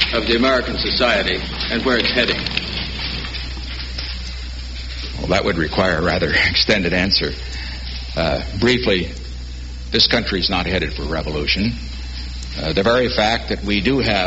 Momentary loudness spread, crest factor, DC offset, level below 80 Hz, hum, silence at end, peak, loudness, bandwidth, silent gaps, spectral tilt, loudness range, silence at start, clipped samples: 14 LU; 18 dB; under 0.1%; -30 dBFS; none; 0 s; -2 dBFS; -18 LUFS; 8 kHz; none; -2.5 dB/octave; 4 LU; 0 s; under 0.1%